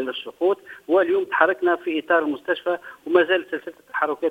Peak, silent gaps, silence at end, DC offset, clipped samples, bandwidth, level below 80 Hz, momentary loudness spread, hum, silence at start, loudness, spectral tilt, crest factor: 0 dBFS; none; 0 s; under 0.1%; under 0.1%; 4.8 kHz; -70 dBFS; 11 LU; none; 0 s; -22 LUFS; -5 dB/octave; 22 dB